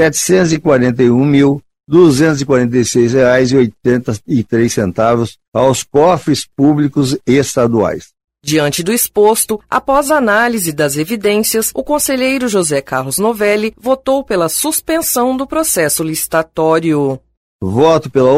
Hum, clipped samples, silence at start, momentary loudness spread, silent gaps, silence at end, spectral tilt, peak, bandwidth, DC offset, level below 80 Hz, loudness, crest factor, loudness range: none; under 0.1%; 0 s; 6 LU; 5.48-5.52 s, 17.37-17.59 s; 0 s; -4.5 dB/octave; 0 dBFS; 16 kHz; under 0.1%; -44 dBFS; -13 LUFS; 12 dB; 3 LU